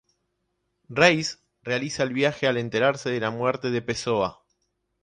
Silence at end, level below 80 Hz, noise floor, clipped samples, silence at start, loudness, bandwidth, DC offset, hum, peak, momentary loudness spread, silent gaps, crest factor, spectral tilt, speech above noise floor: 0.7 s; -60 dBFS; -76 dBFS; under 0.1%; 0.9 s; -24 LUFS; 10.5 kHz; under 0.1%; none; -4 dBFS; 11 LU; none; 22 dB; -4.5 dB/octave; 52 dB